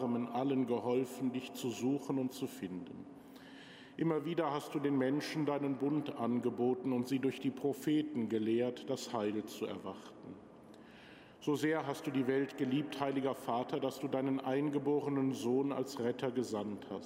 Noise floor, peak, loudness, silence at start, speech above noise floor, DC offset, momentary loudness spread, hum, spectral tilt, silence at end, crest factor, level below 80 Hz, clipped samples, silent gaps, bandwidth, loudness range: -57 dBFS; -20 dBFS; -36 LUFS; 0 s; 21 dB; under 0.1%; 17 LU; none; -6 dB/octave; 0 s; 16 dB; -80 dBFS; under 0.1%; none; 16 kHz; 4 LU